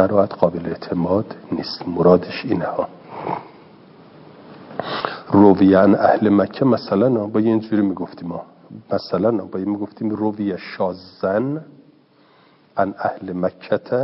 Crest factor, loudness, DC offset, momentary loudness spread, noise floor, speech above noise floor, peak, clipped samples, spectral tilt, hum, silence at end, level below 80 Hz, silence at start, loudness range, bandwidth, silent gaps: 20 dB; -19 LUFS; under 0.1%; 15 LU; -53 dBFS; 35 dB; 0 dBFS; under 0.1%; -11 dB/octave; none; 0 s; -62 dBFS; 0 s; 9 LU; 5.8 kHz; none